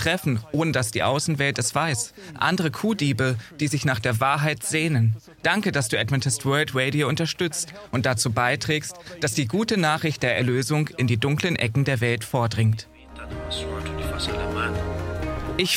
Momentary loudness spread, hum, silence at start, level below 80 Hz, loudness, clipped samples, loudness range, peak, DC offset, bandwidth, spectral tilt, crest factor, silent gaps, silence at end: 8 LU; none; 0 s; -44 dBFS; -24 LUFS; under 0.1%; 3 LU; -4 dBFS; under 0.1%; 16.5 kHz; -4.5 dB/octave; 18 dB; none; 0 s